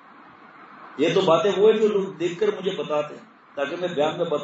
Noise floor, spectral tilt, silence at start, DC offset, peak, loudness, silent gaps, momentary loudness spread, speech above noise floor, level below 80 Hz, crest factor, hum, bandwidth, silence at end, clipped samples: -48 dBFS; -5.5 dB/octave; 0.6 s; under 0.1%; -6 dBFS; -22 LUFS; none; 12 LU; 26 dB; -76 dBFS; 16 dB; none; 8 kHz; 0 s; under 0.1%